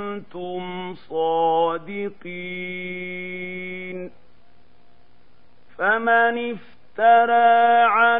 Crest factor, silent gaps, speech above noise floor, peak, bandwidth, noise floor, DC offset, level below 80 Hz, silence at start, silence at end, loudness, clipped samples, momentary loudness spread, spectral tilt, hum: 18 dB; none; 38 dB; -4 dBFS; 3.9 kHz; -58 dBFS; 0.9%; -68 dBFS; 0 s; 0 s; -21 LUFS; under 0.1%; 18 LU; -8 dB/octave; none